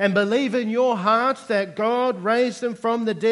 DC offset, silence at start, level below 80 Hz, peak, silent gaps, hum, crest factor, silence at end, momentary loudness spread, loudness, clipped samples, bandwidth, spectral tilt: under 0.1%; 0 s; -74 dBFS; -6 dBFS; none; none; 16 dB; 0 s; 5 LU; -21 LUFS; under 0.1%; 11.5 kHz; -5.5 dB/octave